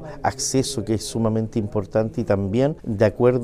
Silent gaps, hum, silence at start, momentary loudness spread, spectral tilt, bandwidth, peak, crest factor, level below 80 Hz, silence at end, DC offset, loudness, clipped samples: none; none; 0 s; 6 LU; -5.5 dB/octave; 15.5 kHz; -4 dBFS; 18 dB; -44 dBFS; 0 s; under 0.1%; -22 LUFS; under 0.1%